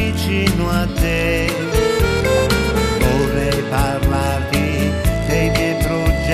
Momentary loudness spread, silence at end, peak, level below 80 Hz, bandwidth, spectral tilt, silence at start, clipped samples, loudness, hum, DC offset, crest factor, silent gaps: 2 LU; 0 s; -2 dBFS; -24 dBFS; 14 kHz; -5.5 dB/octave; 0 s; under 0.1%; -17 LUFS; none; under 0.1%; 16 dB; none